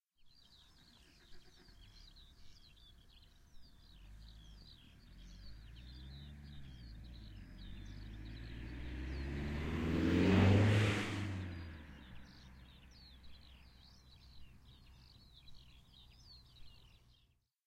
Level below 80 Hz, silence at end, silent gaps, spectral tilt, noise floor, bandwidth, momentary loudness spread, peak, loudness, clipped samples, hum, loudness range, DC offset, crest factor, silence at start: -54 dBFS; 0.8 s; none; -7 dB/octave; -75 dBFS; 11 kHz; 29 LU; -18 dBFS; -36 LUFS; under 0.1%; none; 26 LU; under 0.1%; 24 dB; 0.25 s